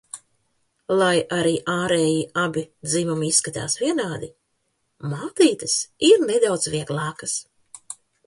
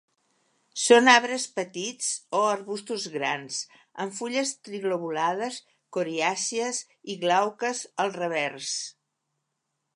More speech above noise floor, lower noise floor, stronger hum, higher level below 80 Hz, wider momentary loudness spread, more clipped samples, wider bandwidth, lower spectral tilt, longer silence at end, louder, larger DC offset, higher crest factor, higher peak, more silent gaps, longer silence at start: about the same, 51 dB vs 54 dB; second, -72 dBFS vs -80 dBFS; neither; first, -60 dBFS vs -84 dBFS; first, 18 LU vs 15 LU; neither; about the same, 11.5 kHz vs 11.5 kHz; first, -3.5 dB/octave vs -2 dB/octave; second, 0.35 s vs 1.05 s; first, -21 LUFS vs -26 LUFS; neither; about the same, 20 dB vs 24 dB; about the same, -4 dBFS vs -2 dBFS; neither; second, 0.15 s vs 0.75 s